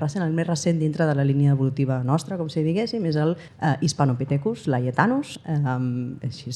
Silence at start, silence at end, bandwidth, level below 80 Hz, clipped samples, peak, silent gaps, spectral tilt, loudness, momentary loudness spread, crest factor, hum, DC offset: 0 s; 0 s; 11.5 kHz; -62 dBFS; under 0.1%; -4 dBFS; none; -6.5 dB/octave; -23 LUFS; 6 LU; 20 dB; none; under 0.1%